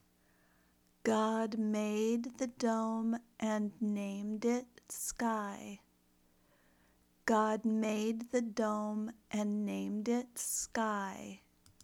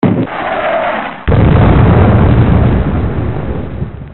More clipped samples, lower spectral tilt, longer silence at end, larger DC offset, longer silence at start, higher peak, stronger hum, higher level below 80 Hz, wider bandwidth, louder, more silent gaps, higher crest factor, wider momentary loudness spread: neither; second, -4.5 dB/octave vs -13 dB/octave; first, 0.45 s vs 0 s; neither; first, 1.05 s vs 0 s; second, -18 dBFS vs 0 dBFS; neither; second, -72 dBFS vs -18 dBFS; first, 18 kHz vs 4.2 kHz; second, -36 LUFS vs -11 LUFS; neither; first, 20 dB vs 10 dB; second, 8 LU vs 12 LU